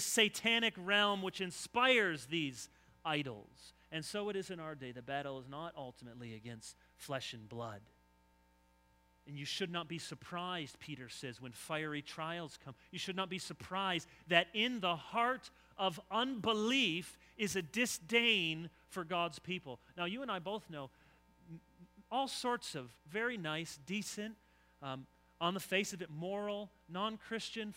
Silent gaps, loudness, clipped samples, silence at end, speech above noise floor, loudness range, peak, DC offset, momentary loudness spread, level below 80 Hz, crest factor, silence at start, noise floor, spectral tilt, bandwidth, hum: none; -38 LUFS; under 0.1%; 0 s; 32 dB; 11 LU; -12 dBFS; under 0.1%; 18 LU; -74 dBFS; 26 dB; 0 s; -71 dBFS; -3 dB/octave; 16 kHz; none